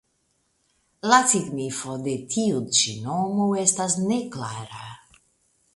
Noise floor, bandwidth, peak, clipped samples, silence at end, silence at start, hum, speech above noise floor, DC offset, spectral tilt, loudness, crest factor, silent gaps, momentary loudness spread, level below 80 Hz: -70 dBFS; 11.5 kHz; -2 dBFS; under 0.1%; 0.8 s; 1.05 s; none; 46 dB; under 0.1%; -3 dB/octave; -23 LUFS; 24 dB; none; 15 LU; -64 dBFS